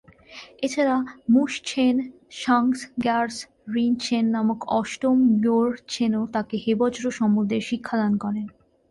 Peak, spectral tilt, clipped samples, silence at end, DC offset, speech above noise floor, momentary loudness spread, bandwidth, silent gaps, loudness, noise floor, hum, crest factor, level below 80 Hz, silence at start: -8 dBFS; -5.5 dB/octave; under 0.1%; 0.4 s; under 0.1%; 23 dB; 9 LU; 11.5 kHz; none; -23 LUFS; -45 dBFS; none; 14 dB; -62 dBFS; 0.3 s